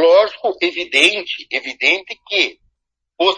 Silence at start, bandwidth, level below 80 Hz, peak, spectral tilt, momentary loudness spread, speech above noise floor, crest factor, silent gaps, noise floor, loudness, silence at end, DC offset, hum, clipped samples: 0 s; 10.5 kHz; -64 dBFS; 0 dBFS; -1 dB/octave; 10 LU; 55 dB; 18 dB; none; -74 dBFS; -16 LUFS; 0 s; under 0.1%; none; under 0.1%